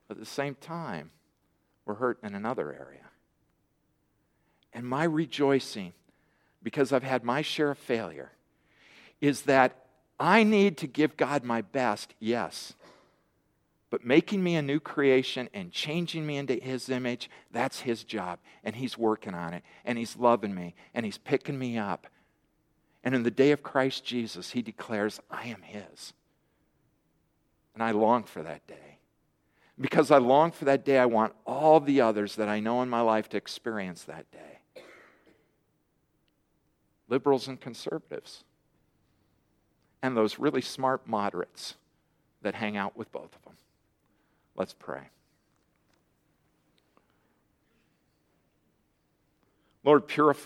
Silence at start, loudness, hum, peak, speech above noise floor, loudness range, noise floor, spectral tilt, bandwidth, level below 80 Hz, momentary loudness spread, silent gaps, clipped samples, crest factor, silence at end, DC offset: 0.1 s; -28 LUFS; none; -6 dBFS; 45 dB; 12 LU; -73 dBFS; -5.5 dB/octave; 15.5 kHz; -76 dBFS; 18 LU; none; under 0.1%; 24 dB; 0 s; under 0.1%